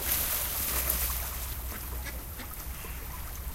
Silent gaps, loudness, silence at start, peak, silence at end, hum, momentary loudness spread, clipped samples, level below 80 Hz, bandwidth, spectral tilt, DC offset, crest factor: none; -32 LUFS; 0 s; -8 dBFS; 0 s; none; 12 LU; under 0.1%; -40 dBFS; 16.5 kHz; -2 dB/octave; under 0.1%; 26 dB